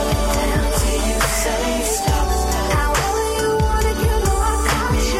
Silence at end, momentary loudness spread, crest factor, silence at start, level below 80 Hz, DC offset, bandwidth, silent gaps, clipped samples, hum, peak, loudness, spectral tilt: 0 s; 1 LU; 14 dB; 0 s; -22 dBFS; under 0.1%; 16.5 kHz; none; under 0.1%; none; -4 dBFS; -19 LUFS; -4 dB/octave